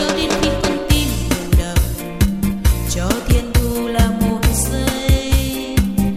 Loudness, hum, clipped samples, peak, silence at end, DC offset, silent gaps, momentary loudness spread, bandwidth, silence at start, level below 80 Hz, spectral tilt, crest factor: -18 LUFS; none; under 0.1%; 0 dBFS; 0 s; under 0.1%; none; 3 LU; 15.5 kHz; 0 s; -20 dBFS; -5 dB/octave; 16 dB